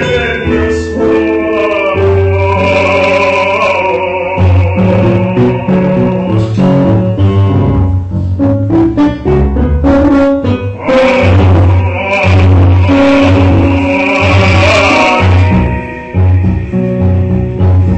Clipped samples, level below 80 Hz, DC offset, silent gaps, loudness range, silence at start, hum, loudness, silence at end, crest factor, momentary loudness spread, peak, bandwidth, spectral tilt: under 0.1%; -22 dBFS; under 0.1%; none; 3 LU; 0 s; none; -9 LUFS; 0 s; 8 dB; 6 LU; 0 dBFS; 8.4 kHz; -7.5 dB/octave